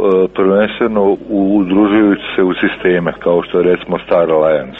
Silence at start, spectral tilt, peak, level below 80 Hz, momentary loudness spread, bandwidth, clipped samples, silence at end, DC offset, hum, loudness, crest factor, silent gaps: 0 s; -9 dB/octave; 0 dBFS; -44 dBFS; 4 LU; 4 kHz; under 0.1%; 0 s; under 0.1%; none; -13 LUFS; 12 dB; none